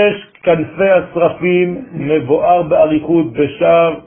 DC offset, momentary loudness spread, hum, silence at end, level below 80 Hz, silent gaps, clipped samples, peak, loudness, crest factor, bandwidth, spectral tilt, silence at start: under 0.1%; 6 LU; none; 0.05 s; -46 dBFS; none; under 0.1%; 0 dBFS; -13 LUFS; 12 dB; 3.5 kHz; -12.5 dB/octave; 0 s